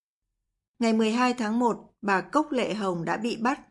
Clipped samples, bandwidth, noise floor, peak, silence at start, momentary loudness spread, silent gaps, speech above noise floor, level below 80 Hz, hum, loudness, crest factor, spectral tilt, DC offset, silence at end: under 0.1%; 11.5 kHz; -84 dBFS; -8 dBFS; 0.8 s; 5 LU; none; 58 dB; -68 dBFS; none; -26 LUFS; 18 dB; -5 dB/octave; under 0.1%; 0.1 s